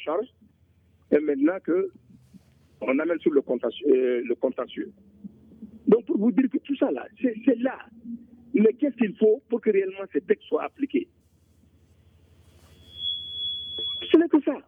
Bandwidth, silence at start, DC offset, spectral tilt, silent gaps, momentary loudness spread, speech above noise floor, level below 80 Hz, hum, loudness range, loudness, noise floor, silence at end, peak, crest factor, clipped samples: 3.8 kHz; 0 s; under 0.1%; -8 dB/octave; none; 12 LU; 37 dB; -66 dBFS; none; 6 LU; -25 LUFS; -61 dBFS; 0.05 s; -6 dBFS; 18 dB; under 0.1%